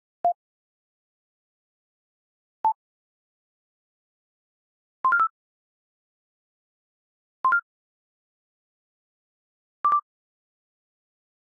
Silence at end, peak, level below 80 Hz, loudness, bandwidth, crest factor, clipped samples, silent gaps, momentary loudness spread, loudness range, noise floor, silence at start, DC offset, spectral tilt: 1.45 s; -14 dBFS; -84 dBFS; -25 LUFS; 2.1 kHz; 18 dB; under 0.1%; 0.35-2.64 s, 2.75-5.04 s, 5.30-7.44 s, 7.62-9.84 s; 6 LU; 8 LU; under -90 dBFS; 0.25 s; under 0.1%; 6.5 dB/octave